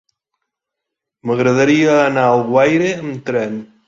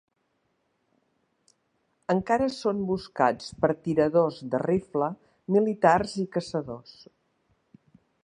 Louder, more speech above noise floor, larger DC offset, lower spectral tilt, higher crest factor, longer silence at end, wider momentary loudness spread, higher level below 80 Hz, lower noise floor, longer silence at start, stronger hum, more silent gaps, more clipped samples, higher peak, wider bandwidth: first, -15 LUFS vs -26 LUFS; first, 67 dB vs 49 dB; neither; about the same, -6 dB/octave vs -6.5 dB/octave; second, 14 dB vs 22 dB; second, 0.25 s vs 1.45 s; about the same, 10 LU vs 11 LU; about the same, -58 dBFS vs -60 dBFS; first, -81 dBFS vs -74 dBFS; second, 1.25 s vs 2.1 s; neither; neither; neither; first, -2 dBFS vs -6 dBFS; second, 7.8 kHz vs 10.5 kHz